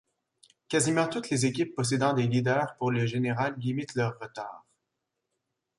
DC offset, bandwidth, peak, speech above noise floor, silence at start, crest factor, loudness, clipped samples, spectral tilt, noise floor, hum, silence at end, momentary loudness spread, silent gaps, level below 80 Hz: under 0.1%; 11.5 kHz; -12 dBFS; 56 dB; 0.7 s; 18 dB; -28 LUFS; under 0.1%; -5 dB/octave; -83 dBFS; none; 1.2 s; 7 LU; none; -66 dBFS